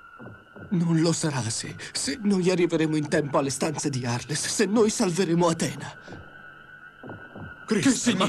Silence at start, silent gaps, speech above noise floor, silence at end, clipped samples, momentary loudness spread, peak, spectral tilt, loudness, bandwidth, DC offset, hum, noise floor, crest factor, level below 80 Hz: 0.05 s; none; 23 dB; 0 s; under 0.1%; 22 LU; -10 dBFS; -4.5 dB/octave; -25 LUFS; 13 kHz; under 0.1%; none; -47 dBFS; 16 dB; -60 dBFS